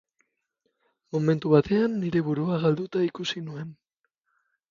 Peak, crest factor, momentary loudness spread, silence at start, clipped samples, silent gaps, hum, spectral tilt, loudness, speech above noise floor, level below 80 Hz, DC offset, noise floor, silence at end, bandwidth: -6 dBFS; 22 dB; 13 LU; 1.15 s; under 0.1%; none; none; -7.5 dB/octave; -25 LUFS; 54 dB; -62 dBFS; under 0.1%; -78 dBFS; 1 s; 7.4 kHz